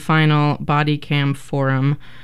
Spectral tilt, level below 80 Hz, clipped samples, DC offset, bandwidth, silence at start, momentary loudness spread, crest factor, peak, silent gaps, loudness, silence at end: -7.5 dB/octave; -48 dBFS; under 0.1%; 2%; 12 kHz; 0 s; 6 LU; 14 dB; -4 dBFS; none; -18 LUFS; 0.25 s